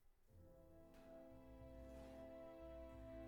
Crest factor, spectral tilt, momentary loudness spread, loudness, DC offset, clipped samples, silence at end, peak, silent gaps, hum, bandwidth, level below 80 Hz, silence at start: 14 dB; -7.5 dB/octave; 9 LU; -61 LUFS; under 0.1%; under 0.1%; 0 s; -46 dBFS; none; none; 19 kHz; -66 dBFS; 0 s